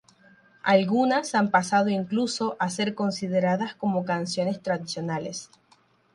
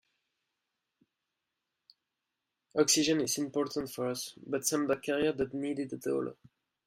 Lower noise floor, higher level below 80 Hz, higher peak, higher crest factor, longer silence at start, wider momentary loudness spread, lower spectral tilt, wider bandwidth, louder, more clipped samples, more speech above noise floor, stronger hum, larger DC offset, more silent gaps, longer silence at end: second, -62 dBFS vs -87 dBFS; about the same, -70 dBFS vs -70 dBFS; first, -6 dBFS vs -12 dBFS; about the same, 20 dB vs 22 dB; second, 0.65 s vs 2.75 s; about the same, 9 LU vs 10 LU; first, -5 dB/octave vs -3 dB/octave; second, 11.5 kHz vs 16 kHz; first, -25 LUFS vs -32 LUFS; neither; second, 37 dB vs 55 dB; neither; neither; neither; first, 0.7 s vs 0.55 s